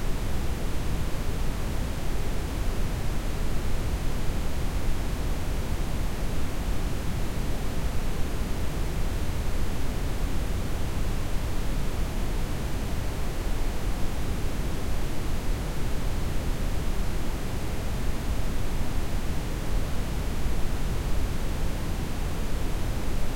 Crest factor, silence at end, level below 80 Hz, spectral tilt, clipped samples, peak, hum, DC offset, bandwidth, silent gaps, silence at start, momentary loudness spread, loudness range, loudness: 12 dB; 0 s; -28 dBFS; -5.5 dB/octave; under 0.1%; -12 dBFS; none; under 0.1%; 16.5 kHz; none; 0 s; 1 LU; 0 LU; -32 LUFS